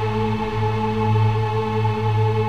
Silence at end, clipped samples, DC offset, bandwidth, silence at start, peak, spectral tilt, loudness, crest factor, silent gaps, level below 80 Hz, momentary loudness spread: 0 s; under 0.1%; 1%; 6.4 kHz; 0 s; -8 dBFS; -8 dB/octave; -21 LUFS; 10 dB; none; -40 dBFS; 3 LU